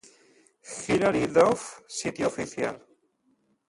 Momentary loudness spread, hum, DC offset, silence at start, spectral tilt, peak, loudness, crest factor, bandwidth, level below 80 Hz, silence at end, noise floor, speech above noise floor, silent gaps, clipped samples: 15 LU; none; under 0.1%; 0.65 s; -4.5 dB/octave; -8 dBFS; -26 LUFS; 22 dB; 11.5 kHz; -60 dBFS; 0.9 s; -69 dBFS; 44 dB; none; under 0.1%